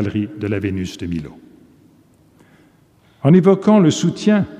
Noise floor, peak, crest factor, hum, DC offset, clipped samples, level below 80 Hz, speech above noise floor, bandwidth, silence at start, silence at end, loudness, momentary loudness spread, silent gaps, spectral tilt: -53 dBFS; -2 dBFS; 16 dB; none; under 0.1%; under 0.1%; -50 dBFS; 38 dB; 9.8 kHz; 0 s; 0 s; -16 LUFS; 14 LU; none; -7 dB/octave